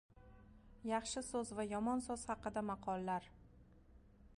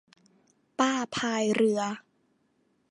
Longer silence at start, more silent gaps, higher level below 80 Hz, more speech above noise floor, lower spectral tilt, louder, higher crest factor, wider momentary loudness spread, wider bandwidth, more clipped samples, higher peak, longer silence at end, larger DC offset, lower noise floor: second, 0.15 s vs 0.8 s; neither; first, -64 dBFS vs -72 dBFS; second, 23 dB vs 44 dB; about the same, -4.5 dB/octave vs -4 dB/octave; second, -42 LUFS vs -27 LUFS; about the same, 18 dB vs 20 dB; second, 6 LU vs 13 LU; about the same, 11.5 kHz vs 11 kHz; neither; second, -26 dBFS vs -10 dBFS; second, 0.05 s vs 0.9 s; neither; second, -64 dBFS vs -71 dBFS